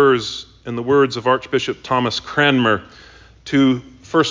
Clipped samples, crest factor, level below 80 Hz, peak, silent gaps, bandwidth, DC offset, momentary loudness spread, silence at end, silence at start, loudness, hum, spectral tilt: under 0.1%; 16 dB; -50 dBFS; -2 dBFS; none; 7.6 kHz; under 0.1%; 11 LU; 0 s; 0 s; -18 LUFS; none; -5.5 dB/octave